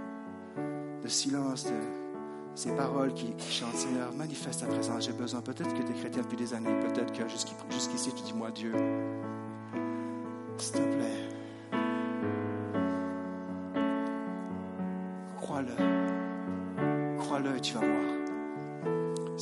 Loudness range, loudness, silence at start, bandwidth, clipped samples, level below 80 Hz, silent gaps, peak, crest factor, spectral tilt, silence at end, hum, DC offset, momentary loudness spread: 3 LU; -34 LUFS; 0 s; 11.5 kHz; under 0.1%; -78 dBFS; none; -16 dBFS; 18 dB; -4.5 dB/octave; 0 s; none; under 0.1%; 9 LU